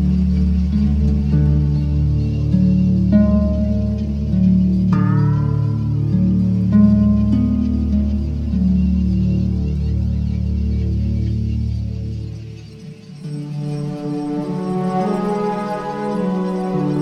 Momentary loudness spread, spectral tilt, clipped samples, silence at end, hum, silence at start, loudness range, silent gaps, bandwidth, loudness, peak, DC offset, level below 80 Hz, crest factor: 10 LU; -10 dB/octave; under 0.1%; 0 s; none; 0 s; 8 LU; none; 6.4 kHz; -18 LUFS; -2 dBFS; under 0.1%; -24 dBFS; 14 dB